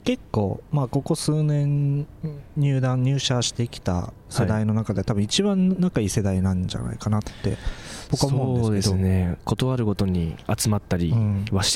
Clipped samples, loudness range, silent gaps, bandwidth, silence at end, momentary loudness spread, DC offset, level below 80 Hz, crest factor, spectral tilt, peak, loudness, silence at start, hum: under 0.1%; 1 LU; none; 16 kHz; 0 s; 7 LU; under 0.1%; -42 dBFS; 16 dB; -5.5 dB/octave; -8 dBFS; -24 LUFS; 0.05 s; none